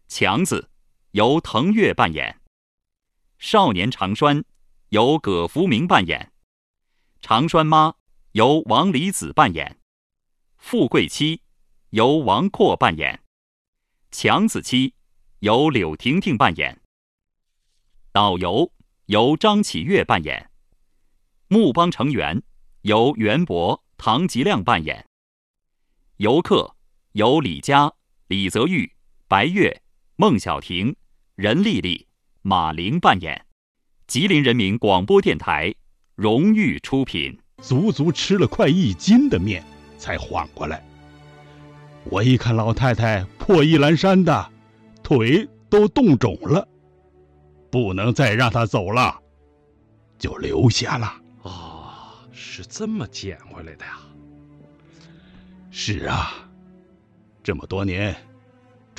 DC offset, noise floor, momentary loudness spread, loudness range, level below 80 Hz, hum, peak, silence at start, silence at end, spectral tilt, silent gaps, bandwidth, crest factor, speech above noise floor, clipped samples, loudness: under 0.1%; -70 dBFS; 15 LU; 7 LU; -48 dBFS; none; 0 dBFS; 0.1 s; 0.8 s; -5.5 dB/octave; 2.47-2.78 s, 6.43-6.74 s, 8.00-8.06 s, 9.82-10.10 s, 13.27-13.73 s, 16.85-17.18 s, 25.06-25.54 s, 33.52-33.75 s; 13.5 kHz; 20 dB; 51 dB; under 0.1%; -19 LUFS